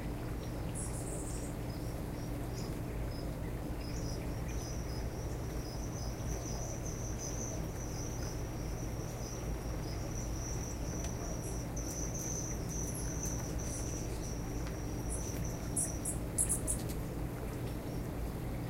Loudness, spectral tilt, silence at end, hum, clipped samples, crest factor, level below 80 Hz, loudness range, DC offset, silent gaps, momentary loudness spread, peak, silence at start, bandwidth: -39 LUFS; -5 dB/octave; 0 s; none; under 0.1%; 20 dB; -44 dBFS; 4 LU; under 0.1%; none; 5 LU; -18 dBFS; 0 s; 16 kHz